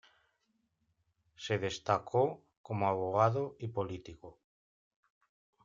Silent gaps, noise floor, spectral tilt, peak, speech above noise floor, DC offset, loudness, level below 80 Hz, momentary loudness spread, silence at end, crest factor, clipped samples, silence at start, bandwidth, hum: 2.57-2.64 s; -79 dBFS; -6 dB/octave; -14 dBFS; 46 dB; under 0.1%; -34 LUFS; -70 dBFS; 17 LU; 1.35 s; 24 dB; under 0.1%; 1.4 s; 7.6 kHz; none